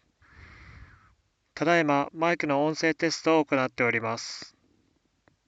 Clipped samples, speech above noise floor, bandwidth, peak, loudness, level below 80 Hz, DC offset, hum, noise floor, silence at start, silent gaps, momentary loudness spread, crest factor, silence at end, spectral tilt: under 0.1%; 44 dB; 8 kHz; -10 dBFS; -26 LUFS; -64 dBFS; under 0.1%; none; -70 dBFS; 0.4 s; none; 13 LU; 20 dB; 1 s; -4.5 dB/octave